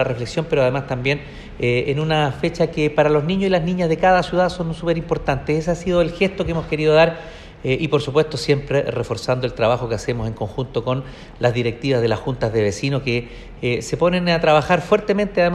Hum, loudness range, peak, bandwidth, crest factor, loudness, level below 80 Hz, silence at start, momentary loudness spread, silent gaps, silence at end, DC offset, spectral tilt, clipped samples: none; 3 LU; -2 dBFS; 12 kHz; 18 dB; -20 LUFS; -40 dBFS; 0 s; 8 LU; none; 0 s; under 0.1%; -6 dB/octave; under 0.1%